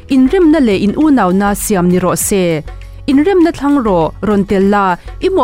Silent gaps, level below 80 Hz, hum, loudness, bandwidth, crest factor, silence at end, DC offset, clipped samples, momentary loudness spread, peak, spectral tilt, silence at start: none; -32 dBFS; none; -12 LUFS; 16 kHz; 8 dB; 0 s; 0.4%; under 0.1%; 6 LU; -2 dBFS; -5.5 dB/octave; 0.05 s